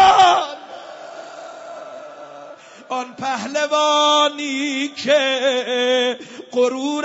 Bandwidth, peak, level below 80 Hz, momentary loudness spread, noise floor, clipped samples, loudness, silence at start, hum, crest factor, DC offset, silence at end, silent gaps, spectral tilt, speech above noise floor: 8 kHz; -2 dBFS; -62 dBFS; 21 LU; -40 dBFS; under 0.1%; -18 LUFS; 0 s; none; 16 dB; under 0.1%; 0 s; none; -2 dB/octave; 21 dB